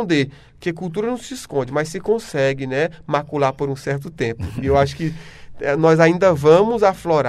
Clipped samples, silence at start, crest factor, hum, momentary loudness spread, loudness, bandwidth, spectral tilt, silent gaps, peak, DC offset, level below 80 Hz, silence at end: under 0.1%; 0 s; 18 dB; none; 13 LU; -19 LUFS; 13.5 kHz; -6.5 dB/octave; none; 0 dBFS; under 0.1%; -44 dBFS; 0 s